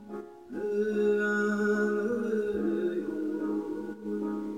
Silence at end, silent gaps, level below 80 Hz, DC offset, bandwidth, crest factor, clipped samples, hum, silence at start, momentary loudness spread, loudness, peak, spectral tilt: 0 s; none; -66 dBFS; under 0.1%; 9.8 kHz; 12 dB; under 0.1%; none; 0 s; 10 LU; -30 LUFS; -18 dBFS; -7 dB/octave